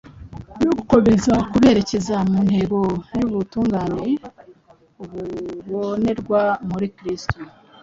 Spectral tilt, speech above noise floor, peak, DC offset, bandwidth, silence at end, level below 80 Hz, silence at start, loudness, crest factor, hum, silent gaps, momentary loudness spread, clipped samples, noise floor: -7 dB/octave; 32 dB; -2 dBFS; under 0.1%; 7.8 kHz; 0.35 s; -44 dBFS; 0.15 s; -20 LUFS; 18 dB; none; none; 17 LU; under 0.1%; -51 dBFS